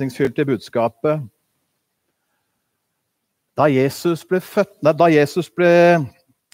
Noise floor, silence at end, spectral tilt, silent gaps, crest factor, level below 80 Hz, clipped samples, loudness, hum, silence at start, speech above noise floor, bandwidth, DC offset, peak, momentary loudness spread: -74 dBFS; 0.45 s; -6.5 dB/octave; none; 16 dB; -64 dBFS; under 0.1%; -17 LUFS; none; 0 s; 57 dB; 16 kHz; under 0.1%; -2 dBFS; 10 LU